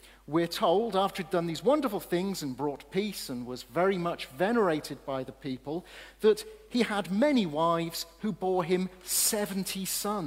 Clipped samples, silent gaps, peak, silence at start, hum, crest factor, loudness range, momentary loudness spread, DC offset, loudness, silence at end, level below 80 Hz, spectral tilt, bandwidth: under 0.1%; none; -12 dBFS; 0.05 s; none; 16 dB; 3 LU; 10 LU; under 0.1%; -30 LUFS; 0 s; -60 dBFS; -4 dB/octave; 16 kHz